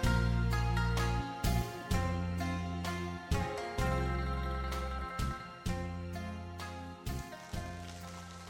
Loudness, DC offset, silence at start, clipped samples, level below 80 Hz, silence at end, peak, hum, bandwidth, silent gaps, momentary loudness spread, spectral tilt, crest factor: -37 LUFS; under 0.1%; 0 s; under 0.1%; -40 dBFS; 0 s; -20 dBFS; none; 16.5 kHz; none; 11 LU; -6 dB/octave; 16 dB